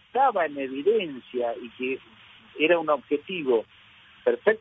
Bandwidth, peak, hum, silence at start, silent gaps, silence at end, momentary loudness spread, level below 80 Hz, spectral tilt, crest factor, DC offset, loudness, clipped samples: 4 kHz; -4 dBFS; none; 0.15 s; none; 0.05 s; 10 LU; -72 dBFS; -7.5 dB/octave; 22 dB; under 0.1%; -26 LUFS; under 0.1%